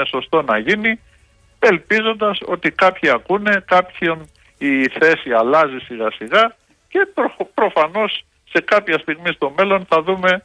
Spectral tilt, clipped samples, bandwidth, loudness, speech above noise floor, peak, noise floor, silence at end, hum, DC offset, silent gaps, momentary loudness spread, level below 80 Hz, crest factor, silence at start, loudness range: -5.5 dB/octave; under 0.1%; 10.5 kHz; -17 LUFS; 36 dB; -4 dBFS; -53 dBFS; 0.05 s; none; under 0.1%; none; 7 LU; -56 dBFS; 14 dB; 0 s; 2 LU